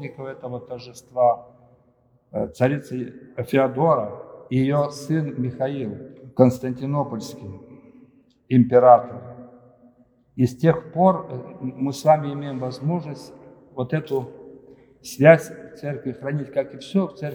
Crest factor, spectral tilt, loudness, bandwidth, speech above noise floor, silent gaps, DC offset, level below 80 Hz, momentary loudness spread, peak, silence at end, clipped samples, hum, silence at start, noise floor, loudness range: 22 dB; -7.5 dB/octave; -21 LUFS; over 20 kHz; 39 dB; none; under 0.1%; -62 dBFS; 20 LU; 0 dBFS; 0 s; under 0.1%; none; 0 s; -60 dBFS; 5 LU